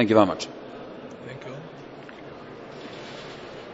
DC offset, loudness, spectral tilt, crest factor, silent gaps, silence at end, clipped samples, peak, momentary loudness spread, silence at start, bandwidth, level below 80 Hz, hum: under 0.1%; -30 LUFS; -6 dB/octave; 24 dB; none; 0 s; under 0.1%; -4 dBFS; 19 LU; 0 s; 8 kHz; -64 dBFS; none